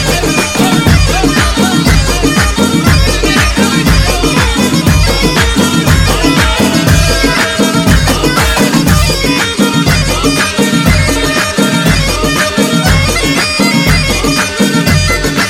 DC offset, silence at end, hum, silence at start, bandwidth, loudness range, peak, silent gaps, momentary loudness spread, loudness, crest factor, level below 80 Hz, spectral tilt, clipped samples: under 0.1%; 0 s; none; 0 s; 17.5 kHz; 1 LU; 0 dBFS; none; 2 LU; -9 LUFS; 8 dB; -18 dBFS; -4 dB/octave; 0.3%